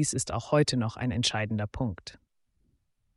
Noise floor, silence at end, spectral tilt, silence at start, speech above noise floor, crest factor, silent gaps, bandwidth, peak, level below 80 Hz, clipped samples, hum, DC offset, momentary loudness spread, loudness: -72 dBFS; 1 s; -4.5 dB/octave; 0 s; 43 dB; 18 dB; none; 11.5 kHz; -12 dBFS; -52 dBFS; under 0.1%; none; under 0.1%; 9 LU; -29 LUFS